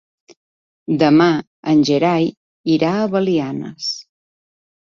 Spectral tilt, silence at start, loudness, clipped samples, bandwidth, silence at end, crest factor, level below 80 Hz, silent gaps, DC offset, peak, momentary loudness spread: -6 dB/octave; 0.9 s; -17 LUFS; under 0.1%; 7.4 kHz; 0.85 s; 16 dB; -60 dBFS; 1.47-1.63 s, 2.37-2.64 s; under 0.1%; -2 dBFS; 12 LU